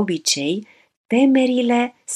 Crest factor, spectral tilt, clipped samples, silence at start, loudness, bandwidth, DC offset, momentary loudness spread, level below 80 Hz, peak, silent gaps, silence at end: 16 dB; -3.5 dB/octave; under 0.1%; 0 s; -18 LUFS; 13.5 kHz; under 0.1%; 8 LU; -76 dBFS; -4 dBFS; 0.97-1.04 s; 0 s